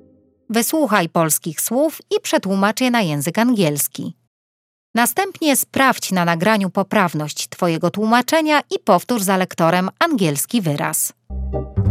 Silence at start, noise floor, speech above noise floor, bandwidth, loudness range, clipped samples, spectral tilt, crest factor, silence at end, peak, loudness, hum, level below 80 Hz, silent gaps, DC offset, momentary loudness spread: 0.5 s; -50 dBFS; 32 dB; 16.5 kHz; 2 LU; under 0.1%; -4 dB/octave; 18 dB; 0 s; 0 dBFS; -18 LUFS; none; -40 dBFS; 4.27-4.94 s; under 0.1%; 7 LU